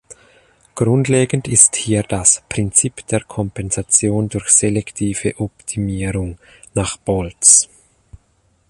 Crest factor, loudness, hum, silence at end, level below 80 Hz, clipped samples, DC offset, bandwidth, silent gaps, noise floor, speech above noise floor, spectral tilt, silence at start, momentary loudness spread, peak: 18 dB; -15 LUFS; none; 1.05 s; -40 dBFS; under 0.1%; under 0.1%; 13.5 kHz; none; -59 dBFS; 43 dB; -4 dB/octave; 0.1 s; 14 LU; 0 dBFS